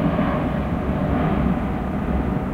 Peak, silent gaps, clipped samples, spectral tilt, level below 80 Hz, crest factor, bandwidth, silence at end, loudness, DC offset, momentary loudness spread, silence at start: -8 dBFS; none; under 0.1%; -9 dB/octave; -30 dBFS; 14 dB; 9.2 kHz; 0 s; -22 LUFS; under 0.1%; 3 LU; 0 s